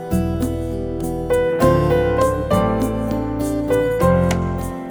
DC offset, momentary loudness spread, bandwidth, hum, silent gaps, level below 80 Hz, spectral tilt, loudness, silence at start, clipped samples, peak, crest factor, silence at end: under 0.1%; 8 LU; over 20 kHz; none; none; -30 dBFS; -7 dB/octave; -19 LUFS; 0 s; under 0.1%; -2 dBFS; 16 dB; 0 s